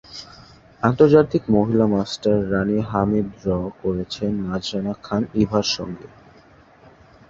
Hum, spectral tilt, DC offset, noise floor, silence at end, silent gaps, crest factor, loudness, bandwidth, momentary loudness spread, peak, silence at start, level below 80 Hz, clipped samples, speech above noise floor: none; -6.5 dB/octave; under 0.1%; -50 dBFS; 1.2 s; none; 20 dB; -20 LUFS; 7.6 kHz; 10 LU; -2 dBFS; 0.1 s; -46 dBFS; under 0.1%; 30 dB